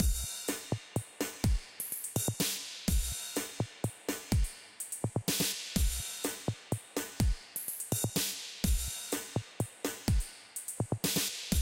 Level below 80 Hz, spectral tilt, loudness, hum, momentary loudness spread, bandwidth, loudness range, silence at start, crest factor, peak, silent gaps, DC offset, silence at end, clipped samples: -40 dBFS; -3.5 dB/octave; -35 LUFS; none; 8 LU; 17 kHz; 1 LU; 0 s; 22 dB; -14 dBFS; none; under 0.1%; 0 s; under 0.1%